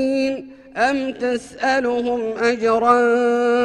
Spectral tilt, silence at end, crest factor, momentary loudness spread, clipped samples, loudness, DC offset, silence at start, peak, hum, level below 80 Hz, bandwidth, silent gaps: -4 dB/octave; 0 s; 16 dB; 9 LU; under 0.1%; -19 LUFS; under 0.1%; 0 s; -2 dBFS; none; -56 dBFS; 10.5 kHz; none